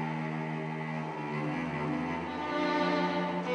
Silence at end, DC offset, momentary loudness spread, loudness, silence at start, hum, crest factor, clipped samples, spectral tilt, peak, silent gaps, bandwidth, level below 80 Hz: 0 s; under 0.1%; 7 LU; -33 LUFS; 0 s; none; 14 dB; under 0.1%; -7 dB/octave; -18 dBFS; none; 10 kHz; -64 dBFS